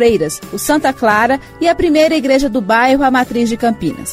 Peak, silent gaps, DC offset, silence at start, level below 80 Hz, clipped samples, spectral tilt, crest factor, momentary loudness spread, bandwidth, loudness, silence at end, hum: 0 dBFS; none; under 0.1%; 0 s; -38 dBFS; under 0.1%; -4 dB/octave; 12 dB; 6 LU; 16 kHz; -13 LUFS; 0 s; none